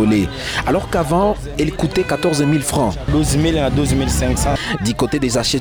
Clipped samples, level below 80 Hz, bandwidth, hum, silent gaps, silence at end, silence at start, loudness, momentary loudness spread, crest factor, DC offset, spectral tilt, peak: under 0.1%; -28 dBFS; over 20 kHz; none; none; 0 s; 0 s; -17 LUFS; 3 LU; 12 dB; under 0.1%; -5 dB/octave; -4 dBFS